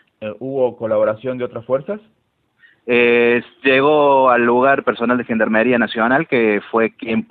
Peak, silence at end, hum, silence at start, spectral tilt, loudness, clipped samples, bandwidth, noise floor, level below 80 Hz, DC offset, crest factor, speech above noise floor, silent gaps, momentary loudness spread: 0 dBFS; 0.05 s; none; 0.2 s; -9.5 dB/octave; -16 LUFS; under 0.1%; 4.6 kHz; -55 dBFS; -58 dBFS; under 0.1%; 16 dB; 39 dB; none; 12 LU